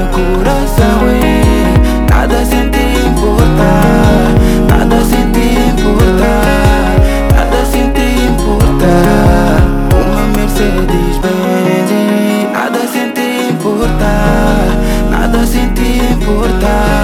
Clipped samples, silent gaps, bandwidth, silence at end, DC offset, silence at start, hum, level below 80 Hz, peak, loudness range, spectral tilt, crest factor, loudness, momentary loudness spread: 0.9%; none; 16.5 kHz; 0 s; under 0.1%; 0 s; none; -14 dBFS; 0 dBFS; 3 LU; -6 dB/octave; 8 dB; -10 LUFS; 4 LU